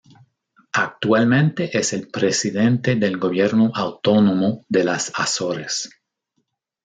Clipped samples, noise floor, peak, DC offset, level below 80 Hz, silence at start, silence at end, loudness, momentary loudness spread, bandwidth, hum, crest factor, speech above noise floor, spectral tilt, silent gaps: under 0.1%; -73 dBFS; -4 dBFS; under 0.1%; -64 dBFS; 0.75 s; 0.95 s; -19 LUFS; 7 LU; 9.4 kHz; none; 16 dB; 54 dB; -5 dB/octave; none